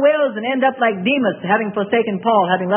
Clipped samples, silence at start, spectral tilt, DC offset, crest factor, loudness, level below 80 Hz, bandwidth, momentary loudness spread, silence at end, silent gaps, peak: under 0.1%; 0 s; -11 dB/octave; under 0.1%; 14 dB; -17 LUFS; -68 dBFS; 3.6 kHz; 3 LU; 0 s; none; -2 dBFS